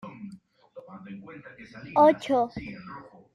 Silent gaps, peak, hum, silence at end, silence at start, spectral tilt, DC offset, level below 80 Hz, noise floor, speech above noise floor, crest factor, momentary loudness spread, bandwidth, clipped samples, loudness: none; -8 dBFS; none; 0.35 s; 0.05 s; -6.5 dB/octave; under 0.1%; -62 dBFS; -50 dBFS; 23 dB; 20 dB; 25 LU; 10.5 kHz; under 0.1%; -23 LUFS